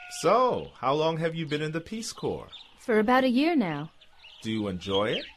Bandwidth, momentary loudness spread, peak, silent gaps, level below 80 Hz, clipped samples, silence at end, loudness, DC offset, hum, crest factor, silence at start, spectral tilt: 13.5 kHz; 15 LU; -10 dBFS; none; -58 dBFS; under 0.1%; 0.05 s; -27 LUFS; under 0.1%; none; 16 dB; 0 s; -5 dB/octave